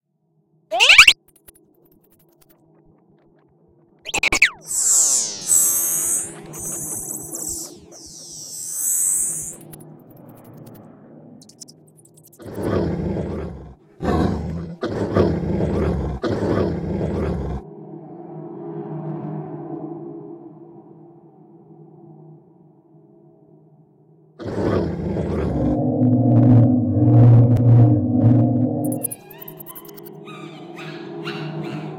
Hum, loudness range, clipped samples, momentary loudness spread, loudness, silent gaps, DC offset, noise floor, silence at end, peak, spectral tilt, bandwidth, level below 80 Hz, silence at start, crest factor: none; 18 LU; under 0.1%; 23 LU; -18 LUFS; none; under 0.1%; -66 dBFS; 0 s; 0 dBFS; -4 dB/octave; 16.5 kHz; -40 dBFS; 0.7 s; 20 dB